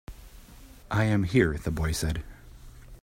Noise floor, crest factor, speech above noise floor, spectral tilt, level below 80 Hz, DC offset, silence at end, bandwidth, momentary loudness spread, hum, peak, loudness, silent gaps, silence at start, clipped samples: -49 dBFS; 20 dB; 23 dB; -6 dB/octave; -40 dBFS; under 0.1%; 0.05 s; 16 kHz; 17 LU; none; -8 dBFS; -27 LUFS; none; 0.1 s; under 0.1%